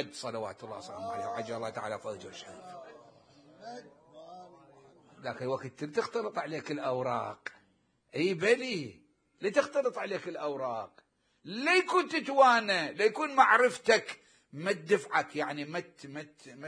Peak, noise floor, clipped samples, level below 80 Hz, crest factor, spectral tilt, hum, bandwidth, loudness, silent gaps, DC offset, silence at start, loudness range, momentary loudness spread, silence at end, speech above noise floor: -8 dBFS; -71 dBFS; under 0.1%; -80 dBFS; 24 dB; -4 dB/octave; none; 10.5 kHz; -30 LUFS; none; under 0.1%; 0 s; 17 LU; 22 LU; 0 s; 40 dB